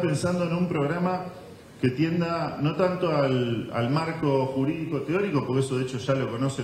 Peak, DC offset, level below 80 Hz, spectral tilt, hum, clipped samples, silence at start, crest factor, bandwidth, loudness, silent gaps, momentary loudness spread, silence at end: -8 dBFS; under 0.1%; -60 dBFS; -7 dB/octave; none; under 0.1%; 0 s; 16 dB; 13 kHz; -26 LUFS; none; 4 LU; 0 s